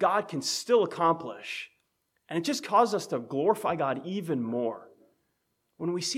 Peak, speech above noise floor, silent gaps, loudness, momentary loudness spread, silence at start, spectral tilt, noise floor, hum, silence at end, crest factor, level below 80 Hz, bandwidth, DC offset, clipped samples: -10 dBFS; 49 dB; none; -29 LUFS; 12 LU; 0 s; -4 dB/octave; -77 dBFS; none; 0 s; 20 dB; -78 dBFS; 16 kHz; under 0.1%; under 0.1%